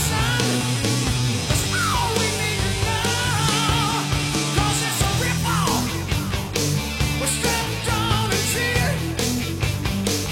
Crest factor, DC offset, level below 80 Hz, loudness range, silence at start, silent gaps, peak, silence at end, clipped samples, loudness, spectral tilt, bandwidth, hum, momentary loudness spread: 18 dB; under 0.1%; -34 dBFS; 1 LU; 0 s; none; -4 dBFS; 0 s; under 0.1%; -21 LUFS; -3.5 dB/octave; 16.5 kHz; none; 3 LU